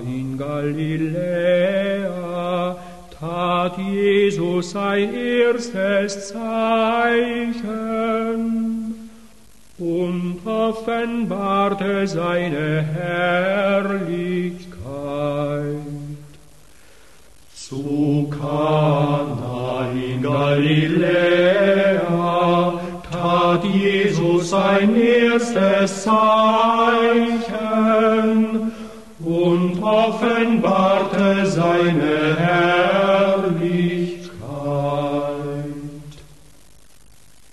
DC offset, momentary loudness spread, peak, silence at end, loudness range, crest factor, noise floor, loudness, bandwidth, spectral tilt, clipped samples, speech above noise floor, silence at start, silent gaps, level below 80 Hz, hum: 0.5%; 12 LU; -4 dBFS; 1.3 s; 8 LU; 14 dB; -51 dBFS; -19 LUFS; 12.5 kHz; -6.5 dB/octave; under 0.1%; 33 dB; 0 s; none; -52 dBFS; none